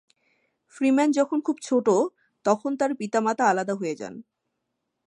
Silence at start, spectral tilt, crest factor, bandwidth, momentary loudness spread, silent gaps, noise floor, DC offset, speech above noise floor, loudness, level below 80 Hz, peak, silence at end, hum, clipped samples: 0.75 s; -5 dB/octave; 20 dB; 11 kHz; 10 LU; none; -80 dBFS; under 0.1%; 56 dB; -24 LUFS; -78 dBFS; -6 dBFS; 0.85 s; none; under 0.1%